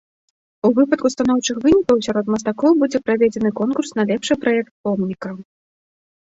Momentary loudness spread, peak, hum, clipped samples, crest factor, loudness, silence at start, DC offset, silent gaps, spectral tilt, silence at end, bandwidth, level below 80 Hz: 7 LU; -4 dBFS; none; under 0.1%; 16 dB; -18 LUFS; 0.65 s; under 0.1%; 4.71-4.84 s; -5 dB/octave; 0.9 s; 8 kHz; -52 dBFS